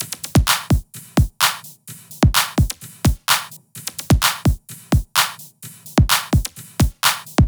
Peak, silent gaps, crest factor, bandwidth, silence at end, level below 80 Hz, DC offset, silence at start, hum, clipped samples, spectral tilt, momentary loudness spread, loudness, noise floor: 0 dBFS; none; 18 dB; over 20 kHz; 0 s; -26 dBFS; under 0.1%; 0 s; none; under 0.1%; -4 dB/octave; 16 LU; -19 LUFS; -40 dBFS